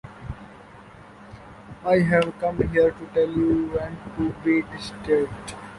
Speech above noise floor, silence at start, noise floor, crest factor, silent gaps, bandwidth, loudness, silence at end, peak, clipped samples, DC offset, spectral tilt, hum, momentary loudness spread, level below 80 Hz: 23 dB; 0.05 s; -46 dBFS; 18 dB; none; 11.5 kHz; -23 LUFS; 0 s; -6 dBFS; under 0.1%; under 0.1%; -7 dB/octave; none; 23 LU; -46 dBFS